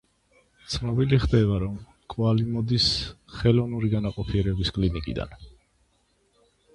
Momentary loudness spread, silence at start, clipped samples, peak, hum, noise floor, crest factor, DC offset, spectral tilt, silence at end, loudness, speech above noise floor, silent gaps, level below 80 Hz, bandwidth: 12 LU; 0.7 s; under 0.1%; -6 dBFS; none; -67 dBFS; 20 dB; under 0.1%; -6.5 dB/octave; 1.25 s; -25 LUFS; 43 dB; none; -38 dBFS; 11 kHz